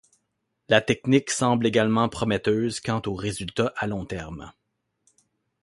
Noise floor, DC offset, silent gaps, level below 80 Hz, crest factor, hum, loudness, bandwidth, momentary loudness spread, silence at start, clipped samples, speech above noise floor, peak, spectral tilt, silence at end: -77 dBFS; under 0.1%; none; -52 dBFS; 22 dB; none; -24 LUFS; 11.5 kHz; 11 LU; 0.7 s; under 0.1%; 53 dB; -2 dBFS; -5 dB/octave; 1.15 s